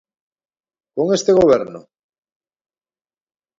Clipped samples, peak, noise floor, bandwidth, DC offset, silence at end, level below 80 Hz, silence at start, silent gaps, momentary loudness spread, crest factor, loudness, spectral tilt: under 0.1%; 0 dBFS; under -90 dBFS; 7.8 kHz; under 0.1%; 1.8 s; -54 dBFS; 0.95 s; none; 17 LU; 20 dB; -15 LUFS; -5.5 dB/octave